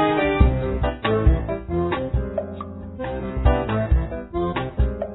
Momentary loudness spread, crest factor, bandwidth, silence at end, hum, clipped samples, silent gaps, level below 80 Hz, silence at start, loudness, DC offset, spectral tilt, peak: 10 LU; 18 dB; 4.1 kHz; 0 s; none; under 0.1%; none; -24 dBFS; 0 s; -23 LUFS; under 0.1%; -11.5 dB/octave; -2 dBFS